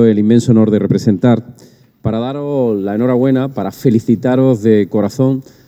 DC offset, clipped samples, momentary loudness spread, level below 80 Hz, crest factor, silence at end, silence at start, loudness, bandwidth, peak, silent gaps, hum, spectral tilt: under 0.1%; under 0.1%; 8 LU; -48 dBFS; 12 dB; 0.25 s; 0 s; -13 LUFS; 15 kHz; 0 dBFS; none; none; -8.5 dB/octave